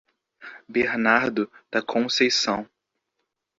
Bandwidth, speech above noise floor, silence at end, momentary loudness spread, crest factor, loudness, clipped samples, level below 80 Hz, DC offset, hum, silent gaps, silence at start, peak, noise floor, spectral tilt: 7.8 kHz; 56 dB; 0.95 s; 10 LU; 22 dB; -23 LUFS; under 0.1%; -64 dBFS; under 0.1%; none; none; 0.4 s; -2 dBFS; -79 dBFS; -3 dB/octave